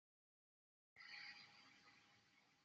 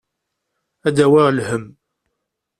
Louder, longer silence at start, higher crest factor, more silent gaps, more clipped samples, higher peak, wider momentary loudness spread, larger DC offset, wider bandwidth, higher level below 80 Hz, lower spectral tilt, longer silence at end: second, -60 LUFS vs -16 LUFS; about the same, 0.95 s vs 0.85 s; about the same, 20 dB vs 16 dB; neither; neither; second, -46 dBFS vs -2 dBFS; about the same, 13 LU vs 12 LU; neither; second, 7.6 kHz vs 12 kHz; second, under -90 dBFS vs -58 dBFS; second, 1.5 dB/octave vs -6.5 dB/octave; second, 0 s vs 0.9 s